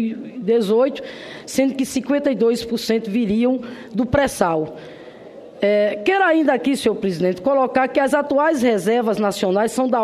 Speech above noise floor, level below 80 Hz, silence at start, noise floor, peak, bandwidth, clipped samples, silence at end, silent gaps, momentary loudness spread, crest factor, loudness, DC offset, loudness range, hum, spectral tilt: 21 dB; -50 dBFS; 0 s; -39 dBFS; -2 dBFS; 13.5 kHz; under 0.1%; 0 s; none; 10 LU; 18 dB; -19 LUFS; under 0.1%; 3 LU; none; -5 dB/octave